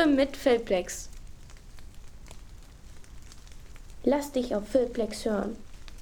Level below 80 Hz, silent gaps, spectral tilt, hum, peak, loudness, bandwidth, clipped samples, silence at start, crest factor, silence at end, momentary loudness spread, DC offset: -46 dBFS; none; -4.5 dB/octave; none; -10 dBFS; -28 LUFS; 19.5 kHz; under 0.1%; 0 s; 20 dB; 0 s; 26 LU; under 0.1%